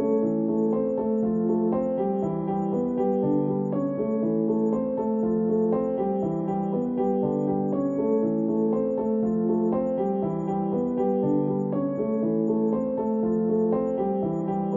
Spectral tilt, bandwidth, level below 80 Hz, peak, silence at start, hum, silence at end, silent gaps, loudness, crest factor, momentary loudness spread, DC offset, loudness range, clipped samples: -11.5 dB/octave; 3.4 kHz; -58 dBFS; -12 dBFS; 0 s; none; 0 s; none; -25 LUFS; 12 dB; 3 LU; under 0.1%; 1 LU; under 0.1%